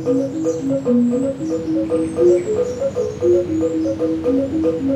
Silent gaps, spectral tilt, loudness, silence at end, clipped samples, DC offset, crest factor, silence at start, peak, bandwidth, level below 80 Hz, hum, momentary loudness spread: none; -7.5 dB/octave; -19 LUFS; 0 s; under 0.1%; under 0.1%; 14 dB; 0 s; -4 dBFS; 8.8 kHz; -48 dBFS; none; 6 LU